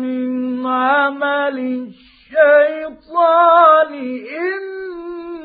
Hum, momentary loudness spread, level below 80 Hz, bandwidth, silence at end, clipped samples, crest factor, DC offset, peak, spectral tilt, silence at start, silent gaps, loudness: none; 18 LU; -62 dBFS; 4.9 kHz; 0 s; under 0.1%; 16 dB; under 0.1%; 0 dBFS; -8.5 dB/octave; 0 s; none; -15 LUFS